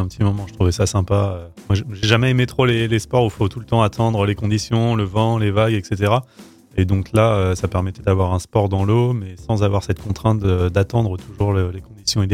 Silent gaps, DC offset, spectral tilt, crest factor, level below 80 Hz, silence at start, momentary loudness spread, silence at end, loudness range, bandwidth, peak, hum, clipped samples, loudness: none; under 0.1%; -6.5 dB/octave; 18 dB; -38 dBFS; 0 s; 6 LU; 0 s; 1 LU; 13.5 kHz; 0 dBFS; none; under 0.1%; -19 LUFS